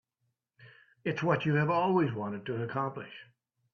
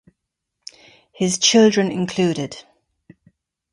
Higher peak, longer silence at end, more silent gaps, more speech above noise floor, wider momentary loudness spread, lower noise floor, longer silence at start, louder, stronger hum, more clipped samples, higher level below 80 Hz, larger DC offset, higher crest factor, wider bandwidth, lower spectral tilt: second, -12 dBFS vs -2 dBFS; second, 0.5 s vs 1.15 s; neither; second, 51 dB vs 62 dB; second, 15 LU vs 27 LU; about the same, -82 dBFS vs -79 dBFS; second, 0.6 s vs 1.2 s; second, -31 LUFS vs -17 LUFS; neither; neither; second, -70 dBFS vs -62 dBFS; neither; about the same, 22 dB vs 18 dB; second, 6.8 kHz vs 11.5 kHz; first, -8 dB/octave vs -4 dB/octave